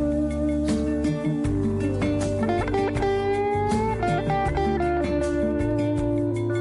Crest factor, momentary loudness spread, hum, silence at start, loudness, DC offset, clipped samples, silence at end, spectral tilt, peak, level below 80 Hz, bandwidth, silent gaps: 12 dB; 1 LU; none; 0 s; -24 LUFS; under 0.1%; under 0.1%; 0 s; -7.5 dB/octave; -12 dBFS; -36 dBFS; 11.5 kHz; none